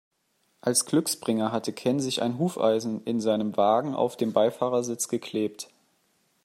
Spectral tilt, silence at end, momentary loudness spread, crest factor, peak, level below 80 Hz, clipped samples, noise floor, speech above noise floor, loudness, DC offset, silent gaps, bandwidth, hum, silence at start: -4.5 dB/octave; 0.8 s; 7 LU; 18 dB; -8 dBFS; -74 dBFS; under 0.1%; -71 dBFS; 45 dB; -26 LUFS; under 0.1%; none; 16 kHz; none; 0.65 s